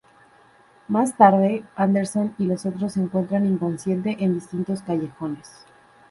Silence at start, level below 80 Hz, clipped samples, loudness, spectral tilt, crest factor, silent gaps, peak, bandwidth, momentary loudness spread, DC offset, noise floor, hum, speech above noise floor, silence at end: 0.9 s; -62 dBFS; under 0.1%; -22 LUFS; -7.5 dB/octave; 22 dB; none; -2 dBFS; 11.5 kHz; 12 LU; under 0.1%; -54 dBFS; none; 33 dB; 0.65 s